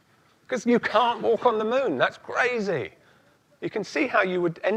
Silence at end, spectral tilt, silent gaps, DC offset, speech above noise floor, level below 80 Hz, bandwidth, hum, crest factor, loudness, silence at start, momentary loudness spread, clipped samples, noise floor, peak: 0 s; -5 dB/octave; none; under 0.1%; 36 dB; -70 dBFS; 9.4 kHz; none; 20 dB; -24 LUFS; 0.5 s; 10 LU; under 0.1%; -60 dBFS; -6 dBFS